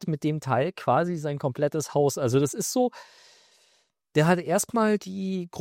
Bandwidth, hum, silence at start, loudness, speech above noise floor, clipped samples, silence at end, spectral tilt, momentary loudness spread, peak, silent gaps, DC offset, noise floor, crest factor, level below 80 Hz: 16.5 kHz; none; 0 s; -26 LUFS; 42 dB; under 0.1%; 0 s; -5.5 dB/octave; 6 LU; -8 dBFS; none; under 0.1%; -67 dBFS; 18 dB; -66 dBFS